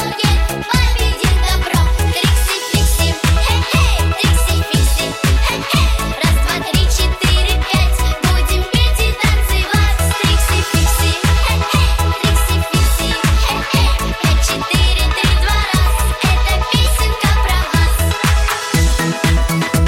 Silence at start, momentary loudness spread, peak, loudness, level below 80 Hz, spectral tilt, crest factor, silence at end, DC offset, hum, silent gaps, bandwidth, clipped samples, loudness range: 0 s; 2 LU; -2 dBFS; -14 LUFS; -16 dBFS; -4 dB/octave; 12 dB; 0 s; under 0.1%; none; none; 16.5 kHz; under 0.1%; 1 LU